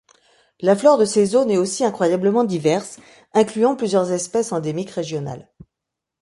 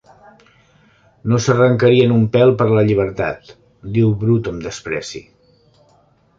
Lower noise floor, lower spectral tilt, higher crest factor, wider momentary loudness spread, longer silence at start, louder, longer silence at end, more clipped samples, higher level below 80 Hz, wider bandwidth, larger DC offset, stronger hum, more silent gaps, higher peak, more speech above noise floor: first, -83 dBFS vs -55 dBFS; second, -5.5 dB/octave vs -7 dB/octave; about the same, 18 dB vs 16 dB; second, 11 LU vs 16 LU; second, 0.6 s vs 1.25 s; second, -19 LUFS vs -16 LUFS; second, 0.8 s vs 1.15 s; neither; second, -62 dBFS vs -46 dBFS; first, 11.5 kHz vs 7.6 kHz; neither; neither; neither; about the same, -2 dBFS vs -2 dBFS; first, 65 dB vs 40 dB